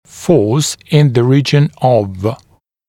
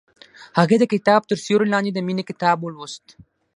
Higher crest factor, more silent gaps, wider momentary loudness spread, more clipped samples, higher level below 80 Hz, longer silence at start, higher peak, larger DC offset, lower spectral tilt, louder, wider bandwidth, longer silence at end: second, 12 dB vs 20 dB; neither; second, 10 LU vs 16 LU; neither; first, -50 dBFS vs -66 dBFS; second, 0.15 s vs 0.4 s; about the same, 0 dBFS vs 0 dBFS; neither; about the same, -6 dB/octave vs -6 dB/octave; first, -13 LUFS vs -19 LUFS; first, 14 kHz vs 11 kHz; about the same, 0.55 s vs 0.6 s